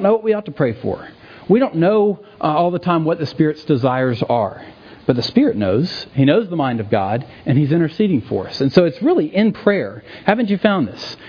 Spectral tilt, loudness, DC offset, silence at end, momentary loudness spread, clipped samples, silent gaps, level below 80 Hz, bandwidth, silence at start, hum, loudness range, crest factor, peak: -8.5 dB/octave; -17 LUFS; under 0.1%; 0 s; 8 LU; under 0.1%; none; -54 dBFS; 5.4 kHz; 0 s; none; 1 LU; 16 dB; 0 dBFS